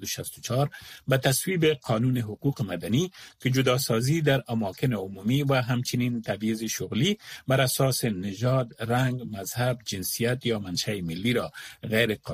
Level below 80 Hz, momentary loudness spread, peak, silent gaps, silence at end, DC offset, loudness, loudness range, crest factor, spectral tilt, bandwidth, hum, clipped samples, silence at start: -58 dBFS; 7 LU; -8 dBFS; none; 0 s; under 0.1%; -27 LUFS; 2 LU; 18 dB; -5 dB/octave; 15.5 kHz; none; under 0.1%; 0 s